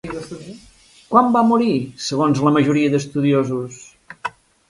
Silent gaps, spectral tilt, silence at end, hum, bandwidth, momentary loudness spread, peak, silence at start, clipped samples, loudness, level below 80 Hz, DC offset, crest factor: none; -6.5 dB/octave; 0.4 s; none; 11.5 kHz; 17 LU; 0 dBFS; 0.05 s; under 0.1%; -17 LUFS; -56 dBFS; under 0.1%; 18 dB